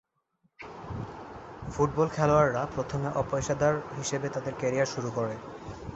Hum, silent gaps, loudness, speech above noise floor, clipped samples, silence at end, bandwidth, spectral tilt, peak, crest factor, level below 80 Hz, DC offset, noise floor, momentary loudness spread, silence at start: none; none; -29 LUFS; 45 dB; under 0.1%; 0 s; 8.2 kHz; -5.5 dB/octave; -10 dBFS; 20 dB; -52 dBFS; under 0.1%; -73 dBFS; 18 LU; 0.6 s